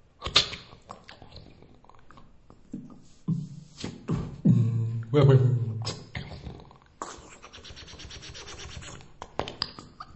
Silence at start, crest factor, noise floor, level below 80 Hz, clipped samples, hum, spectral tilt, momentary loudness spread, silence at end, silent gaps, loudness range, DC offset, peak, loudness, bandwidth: 0.2 s; 24 dB; -52 dBFS; -52 dBFS; under 0.1%; none; -6 dB/octave; 24 LU; 0 s; none; 15 LU; under 0.1%; -6 dBFS; -27 LUFS; 8.4 kHz